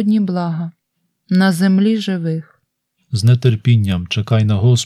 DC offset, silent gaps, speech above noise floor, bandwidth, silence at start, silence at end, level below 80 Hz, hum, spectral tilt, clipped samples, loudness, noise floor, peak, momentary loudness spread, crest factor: under 0.1%; none; 56 dB; 13 kHz; 0 s; 0 s; -50 dBFS; none; -6.5 dB/octave; under 0.1%; -16 LUFS; -70 dBFS; 0 dBFS; 10 LU; 14 dB